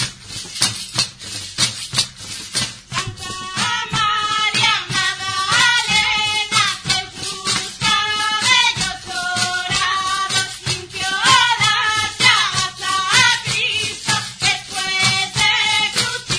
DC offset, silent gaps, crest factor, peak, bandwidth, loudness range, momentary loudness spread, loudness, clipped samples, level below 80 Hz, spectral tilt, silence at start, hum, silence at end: under 0.1%; none; 18 dB; 0 dBFS; 11 kHz; 5 LU; 10 LU; -16 LUFS; under 0.1%; -48 dBFS; -0.5 dB/octave; 0 s; none; 0 s